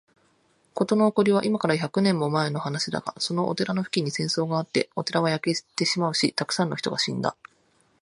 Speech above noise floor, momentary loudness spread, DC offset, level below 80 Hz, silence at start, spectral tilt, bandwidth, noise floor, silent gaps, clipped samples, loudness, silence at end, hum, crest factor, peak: 40 dB; 6 LU; under 0.1%; -68 dBFS; 0.75 s; -5 dB/octave; 11.5 kHz; -65 dBFS; none; under 0.1%; -25 LUFS; 0.7 s; none; 20 dB; -6 dBFS